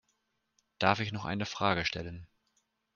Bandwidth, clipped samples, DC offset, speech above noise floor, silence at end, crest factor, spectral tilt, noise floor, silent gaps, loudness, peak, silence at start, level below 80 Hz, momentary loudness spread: 7.2 kHz; under 0.1%; under 0.1%; 46 dB; 0.7 s; 26 dB; -5 dB/octave; -78 dBFS; none; -32 LUFS; -10 dBFS; 0.8 s; -62 dBFS; 13 LU